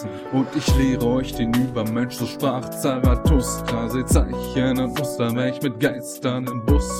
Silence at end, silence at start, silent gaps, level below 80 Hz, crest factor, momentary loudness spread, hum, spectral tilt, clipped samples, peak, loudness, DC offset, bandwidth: 0 s; 0 s; none; -28 dBFS; 16 dB; 5 LU; none; -6 dB/octave; under 0.1%; -4 dBFS; -22 LUFS; under 0.1%; 17.5 kHz